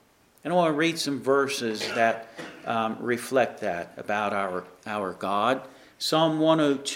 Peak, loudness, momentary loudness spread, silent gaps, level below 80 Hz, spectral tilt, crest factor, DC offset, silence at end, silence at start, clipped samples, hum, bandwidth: -8 dBFS; -26 LUFS; 11 LU; none; -72 dBFS; -4.5 dB/octave; 20 dB; under 0.1%; 0 s; 0.45 s; under 0.1%; none; 16 kHz